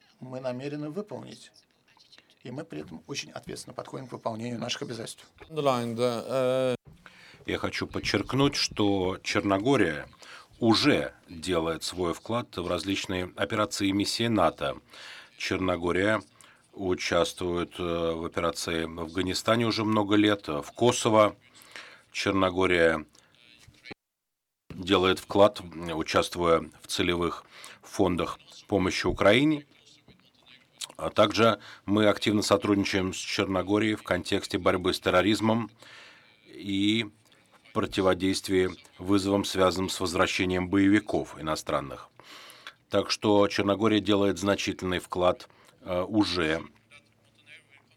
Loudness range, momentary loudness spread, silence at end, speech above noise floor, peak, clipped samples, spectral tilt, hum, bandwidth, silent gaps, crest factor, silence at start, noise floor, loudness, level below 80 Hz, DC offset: 4 LU; 17 LU; 0.4 s; 57 dB; -8 dBFS; under 0.1%; -4.5 dB/octave; none; 16.5 kHz; none; 20 dB; 0.2 s; -84 dBFS; -27 LUFS; -58 dBFS; under 0.1%